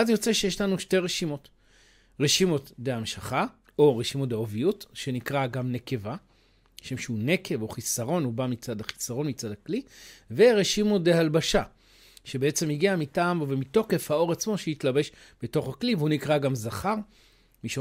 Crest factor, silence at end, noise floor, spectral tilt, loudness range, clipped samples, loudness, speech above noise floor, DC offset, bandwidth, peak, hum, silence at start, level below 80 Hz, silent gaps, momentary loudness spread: 18 dB; 0 s; -62 dBFS; -4.5 dB/octave; 6 LU; under 0.1%; -27 LUFS; 36 dB; under 0.1%; 16 kHz; -8 dBFS; none; 0 s; -54 dBFS; none; 12 LU